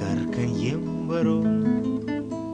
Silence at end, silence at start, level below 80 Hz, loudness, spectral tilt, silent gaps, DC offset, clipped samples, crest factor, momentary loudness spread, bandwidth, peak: 0 s; 0 s; -52 dBFS; -25 LUFS; -7.5 dB/octave; none; under 0.1%; under 0.1%; 12 dB; 6 LU; 9.4 kHz; -12 dBFS